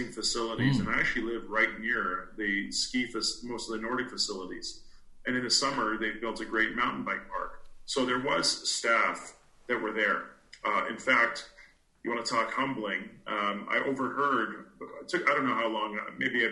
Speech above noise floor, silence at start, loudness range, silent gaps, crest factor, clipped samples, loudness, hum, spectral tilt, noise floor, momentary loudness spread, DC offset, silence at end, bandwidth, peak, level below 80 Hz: 28 dB; 0 s; 2 LU; none; 20 dB; under 0.1%; -30 LUFS; none; -3 dB/octave; -58 dBFS; 12 LU; under 0.1%; 0 s; 11.5 kHz; -12 dBFS; -56 dBFS